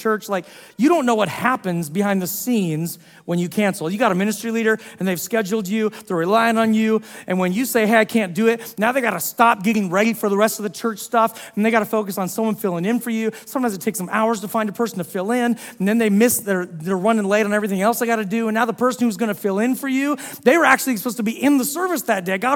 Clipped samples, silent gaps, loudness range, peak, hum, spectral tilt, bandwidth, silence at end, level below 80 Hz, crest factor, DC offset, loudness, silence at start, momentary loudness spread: under 0.1%; none; 3 LU; 0 dBFS; none; -5 dB/octave; 18 kHz; 0 s; -68 dBFS; 20 dB; under 0.1%; -20 LUFS; 0 s; 7 LU